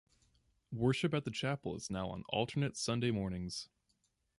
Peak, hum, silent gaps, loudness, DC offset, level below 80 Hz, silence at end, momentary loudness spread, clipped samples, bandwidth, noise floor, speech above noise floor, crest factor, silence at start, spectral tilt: -18 dBFS; none; none; -37 LUFS; under 0.1%; -60 dBFS; 0.75 s; 9 LU; under 0.1%; 11.5 kHz; -79 dBFS; 43 dB; 20 dB; 0.7 s; -5.5 dB/octave